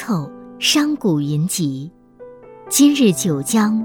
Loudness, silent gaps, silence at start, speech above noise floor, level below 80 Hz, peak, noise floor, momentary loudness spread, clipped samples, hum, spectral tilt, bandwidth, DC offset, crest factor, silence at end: -17 LUFS; none; 0 s; 24 dB; -58 dBFS; -2 dBFS; -41 dBFS; 11 LU; under 0.1%; none; -4 dB/octave; 18.5 kHz; under 0.1%; 16 dB; 0 s